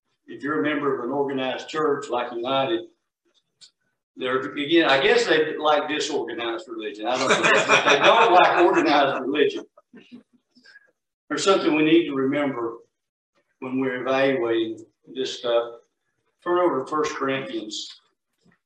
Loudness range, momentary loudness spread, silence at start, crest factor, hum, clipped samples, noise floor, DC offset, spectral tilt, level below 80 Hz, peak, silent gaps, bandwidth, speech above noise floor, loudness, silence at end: 8 LU; 15 LU; 0.3 s; 20 dB; none; under 0.1%; -75 dBFS; under 0.1%; -3.5 dB/octave; -70 dBFS; -2 dBFS; 4.03-4.14 s, 11.14-11.28 s, 13.09-13.33 s; 9.8 kHz; 53 dB; -21 LUFS; 0.7 s